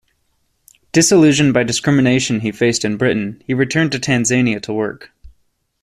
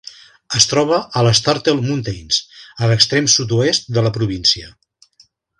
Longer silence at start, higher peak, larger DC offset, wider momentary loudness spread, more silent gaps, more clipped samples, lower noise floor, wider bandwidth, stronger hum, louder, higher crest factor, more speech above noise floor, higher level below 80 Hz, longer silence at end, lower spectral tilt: first, 0.95 s vs 0.05 s; about the same, -2 dBFS vs 0 dBFS; neither; first, 11 LU vs 8 LU; neither; neither; first, -64 dBFS vs -54 dBFS; first, 14 kHz vs 11 kHz; neither; about the same, -15 LUFS vs -15 LUFS; about the same, 14 dB vs 18 dB; first, 49 dB vs 38 dB; about the same, -50 dBFS vs -46 dBFS; second, 0.55 s vs 0.9 s; about the same, -4.5 dB/octave vs -3.5 dB/octave